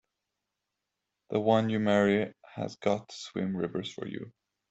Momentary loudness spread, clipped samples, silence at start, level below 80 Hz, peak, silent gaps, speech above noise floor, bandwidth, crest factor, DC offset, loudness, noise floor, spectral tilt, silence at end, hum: 14 LU; under 0.1%; 1.3 s; -70 dBFS; -12 dBFS; none; 57 dB; 8 kHz; 20 dB; under 0.1%; -30 LUFS; -86 dBFS; -6.5 dB/octave; 0.4 s; none